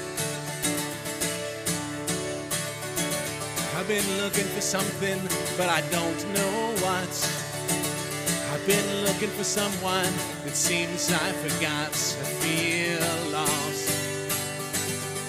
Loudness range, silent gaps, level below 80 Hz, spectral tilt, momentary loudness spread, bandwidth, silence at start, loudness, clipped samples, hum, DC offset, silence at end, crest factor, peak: 3 LU; none; -58 dBFS; -3 dB/octave; 5 LU; 16 kHz; 0 s; -27 LUFS; under 0.1%; none; under 0.1%; 0 s; 20 dB; -8 dBFS